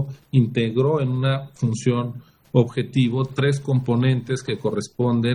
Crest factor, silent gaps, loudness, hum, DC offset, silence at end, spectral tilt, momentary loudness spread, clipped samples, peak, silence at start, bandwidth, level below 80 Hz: 18 dB; none; -22 LUFS; none; under 0.1%; 0 s; -7 dB/octave; 5 LU; under 0.1%; -2 dBFS; 0 s; 11 kHz; -58 dBFS